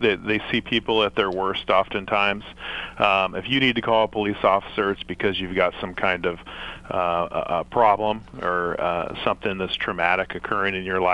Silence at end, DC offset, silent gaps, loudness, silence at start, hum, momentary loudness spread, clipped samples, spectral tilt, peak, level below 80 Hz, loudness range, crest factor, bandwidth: 0 s; under 0.1%; none; -23 LUFS; 0 s; none; 7 LU; under 0.1%; -6 dB/octave; -2 dBFS; -48 dBFS; 2 LU; 22 dB; 11 kHz